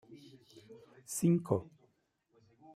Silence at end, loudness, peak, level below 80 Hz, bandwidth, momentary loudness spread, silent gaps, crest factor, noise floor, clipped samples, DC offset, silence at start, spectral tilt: 1.1 s; -33 LUFS; -16 dBFS; -74 dBFS; 15.5 kHz; 26 LU; none; 22 dB; -76 dBFS; under 0.1%; under 0.1%; 0.1 s; -7 dB/octave